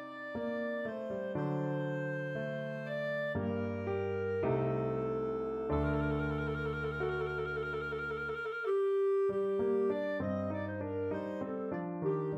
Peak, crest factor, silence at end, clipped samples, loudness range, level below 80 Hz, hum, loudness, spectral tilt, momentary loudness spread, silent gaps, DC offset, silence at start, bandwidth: -22 dBFS; 14 dB; 0 s; under 0.1%; 3 LU; -52 dBFS; none; -35 LUFS; -9 dB/octave; 6 LU; none; under 0.1%; 0 s; 7.8 kHz